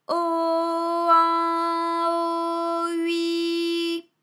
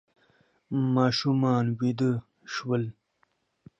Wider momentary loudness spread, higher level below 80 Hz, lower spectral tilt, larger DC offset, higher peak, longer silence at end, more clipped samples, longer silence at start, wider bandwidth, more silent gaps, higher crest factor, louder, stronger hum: second, 7 LU vs 11 LU; second, under -90 dBFS vs -68 dBFS; second, -2 dB/octave vs -7 dB/octave; neither; about the same, -8 dBFS vs -10 dBFS; second, 0.2 s vs 0.9 s; neither; second, 0.1 s vs 0.7 s; first, 14 kHz vs 7.8 kHz; neither; about the same, 16 dB vs 18 dB; first, -23 LUFS vs -27 LUFS; neither